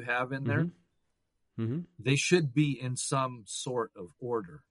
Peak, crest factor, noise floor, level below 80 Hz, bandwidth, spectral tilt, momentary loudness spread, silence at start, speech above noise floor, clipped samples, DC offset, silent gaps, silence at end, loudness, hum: -10 dBFS; 20 dB; -77 dBFS; -70 dBFS; 11.5 kHz; -5 dB/octave; 11 LU; 0 s; 46 dB; under 0.1%; under 0.1%; none; 0.1 s; -31 LUFS; none